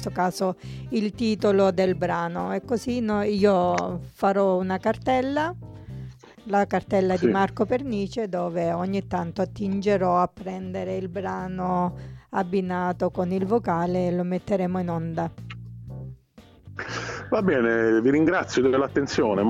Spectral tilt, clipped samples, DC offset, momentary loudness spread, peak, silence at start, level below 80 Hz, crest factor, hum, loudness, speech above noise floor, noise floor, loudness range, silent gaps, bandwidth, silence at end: -7 dB/octave; under 0.1%; under 0.1%; 14 LU; -8 dBFS; 0 s; -52 dBFS; 16 dB; none; -25 LUFS; 28 dB; -52 dBFS; 4 LU; none; 13.5 kHz; 0 s